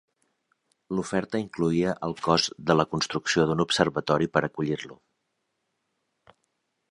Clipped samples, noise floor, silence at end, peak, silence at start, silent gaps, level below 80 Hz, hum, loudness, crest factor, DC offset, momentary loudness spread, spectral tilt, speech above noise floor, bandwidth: under 0.1%; -78 dBFS; 1.95 s; -4 dBFS; 0.9 s; none; -58 dBFS; none; -26 LUFS; 24 dB; under 0.1%; 8 LU; -5 dB/octave; 52 dB; 11.5 kHz